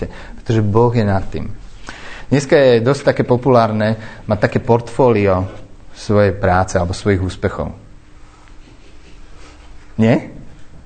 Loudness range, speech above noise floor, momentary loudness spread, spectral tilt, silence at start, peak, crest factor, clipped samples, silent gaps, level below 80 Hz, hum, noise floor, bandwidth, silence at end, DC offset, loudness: 8 LU; 25 dB; 19 LU; -7 dB/octave; 0 s; 0 dBFS; 16 dB; under 0.1%; none; -38 dBFS; none; -39 dBFS; 9.2 kHz; 0.05 s; under 0.1%; -15 LUFS